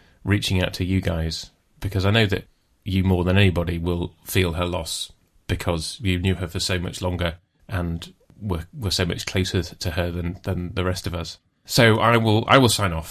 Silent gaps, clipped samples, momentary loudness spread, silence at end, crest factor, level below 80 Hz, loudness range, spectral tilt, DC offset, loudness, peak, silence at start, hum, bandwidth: none; under 0.1%; 14 LU; 0 s; 22 dB; -34 dBFS; 6 LU; -5 dB/octave; under 0.1%; -22 LUFS; 0 dBFS; 0.25 s; none; 14.5 kHz